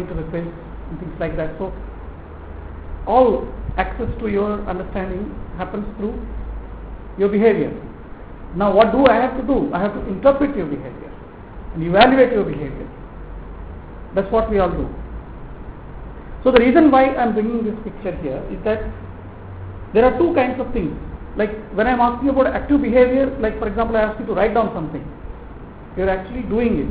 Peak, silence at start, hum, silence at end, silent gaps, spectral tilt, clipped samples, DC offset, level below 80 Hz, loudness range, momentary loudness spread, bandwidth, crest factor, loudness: 0 dBFS; 0 s; none; 0 s; none; -10.5 dB/octave; under 0.1%; 0.2%; -34 dBFS; 7 LU; 22 LU; 4 kHz; 20 dB; -18 LUFS